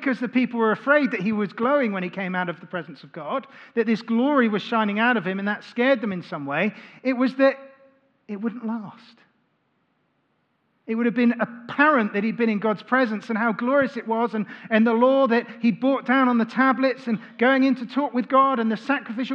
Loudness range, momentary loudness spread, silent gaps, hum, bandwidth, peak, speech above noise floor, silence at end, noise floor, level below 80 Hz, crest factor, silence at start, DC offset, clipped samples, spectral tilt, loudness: 7 LU; 11 LU; none; none; 6.8 kHz; -4 dBFS; 47 dB; 0 s; -69 dBFS; -80 dBFS; 20 dB; 0 s; under 0.1%; under 0.1%; -7.5 dB/octave; -22 LUFS